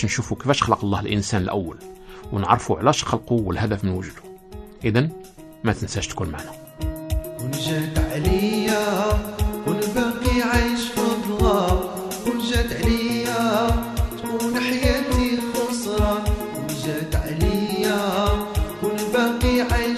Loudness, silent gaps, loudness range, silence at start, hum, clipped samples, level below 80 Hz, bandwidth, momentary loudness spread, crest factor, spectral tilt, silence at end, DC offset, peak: -22 LUFS; none; 4 LU; 0 s; none; under 0.1%; -30 dBFS; 14 kHz; 9 LU; 20 dB; -5.5 dB/octave; 0 s; under 0.1%; -2 dBFS